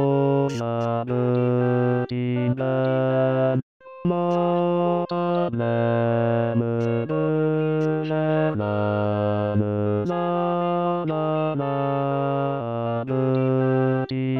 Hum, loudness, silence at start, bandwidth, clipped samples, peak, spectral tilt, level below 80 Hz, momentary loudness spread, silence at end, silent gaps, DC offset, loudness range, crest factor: none; -23 LUFS; 0 s; 7.2 kHz; under 0.1%; -10 dBFS; -9 dB/octave; -64 dBFS; 4 LU; 0 s; 3.63-3.80 s; 0.2%; 1 LU; 12 dB